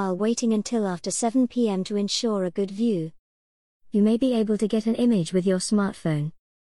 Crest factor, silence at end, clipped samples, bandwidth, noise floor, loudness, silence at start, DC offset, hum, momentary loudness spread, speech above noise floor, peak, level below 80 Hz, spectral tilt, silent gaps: 14 dB; 0.4 s; under 0.1%; 11.5 kHz; under -90 dBFS; -24 LUFS; 0 s; 0.3%; none; 5 LU; over 67 dB; -10 dBFS; -60 dBFS; -5.5 dB/octave; 3.19-3.80 s